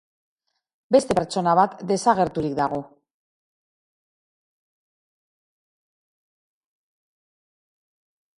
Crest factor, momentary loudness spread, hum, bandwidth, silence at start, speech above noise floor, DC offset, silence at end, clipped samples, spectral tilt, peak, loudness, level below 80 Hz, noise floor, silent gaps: 24 dB; 6 LU; none; 11.5 kHz; 0.9 s; over 69 dB; under 0.1%; 5.5 s; under 0.1%; -5.5 dB/octave; -4 dBFS; -21 LUFS; -58 dBFS; under -90 dBFS; none